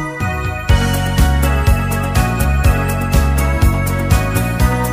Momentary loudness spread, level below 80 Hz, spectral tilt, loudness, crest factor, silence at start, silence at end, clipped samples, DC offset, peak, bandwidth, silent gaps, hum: 3 LU; -18 dBFS; -5.5 dB/octave; -15 LUFS; 14 dB; 0 s; 0 s; under 0.1%; under 0.1%; 0 dBFS; 15.5 kHz; none; none